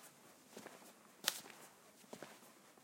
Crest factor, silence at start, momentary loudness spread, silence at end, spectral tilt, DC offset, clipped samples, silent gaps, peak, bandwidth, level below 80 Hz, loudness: 42 dB; 0 s; 21 LU; 0 s; -0.5 dB/octave; under 0.1%; under 0.1%; none; -10 dBFS; 16.5 kHz; under -90 dBFS; -47 LUFS